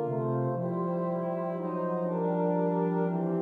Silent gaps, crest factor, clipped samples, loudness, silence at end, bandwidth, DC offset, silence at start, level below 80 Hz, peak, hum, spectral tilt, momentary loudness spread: none; 12 dB; under 0.1%; -30 LUFS; 0 s; 3.7 kHz; under 0.1%; 0 s; -78 dBFS; -16 dBFS; none; -11.5 dB/octave; 4 LU